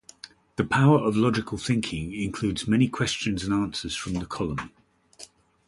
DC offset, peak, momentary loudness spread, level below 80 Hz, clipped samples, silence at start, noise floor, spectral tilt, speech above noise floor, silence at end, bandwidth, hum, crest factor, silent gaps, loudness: under 0.1%; -8 dBFS; 23 LU; -48 dBFS; under 0.1%; 0.25 s; -50 dBFS; -5.5 dB/octave; 25 dB; 0.45 s; 11.5 kHz; none; 18 dB; none; -25 LUFS